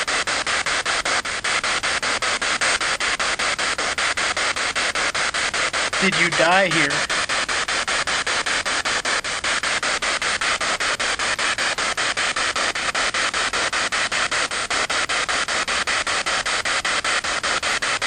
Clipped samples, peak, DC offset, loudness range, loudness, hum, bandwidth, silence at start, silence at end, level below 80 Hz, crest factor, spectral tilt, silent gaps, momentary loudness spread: under 0.1%; -4 dBFS; under 0.1%; 2 LU; -20 LUFS; none; 15.5 kHz; 0 s; 0 s; -48 dBFS; 18 dB; -0.5 dB/octave; none; 2 LU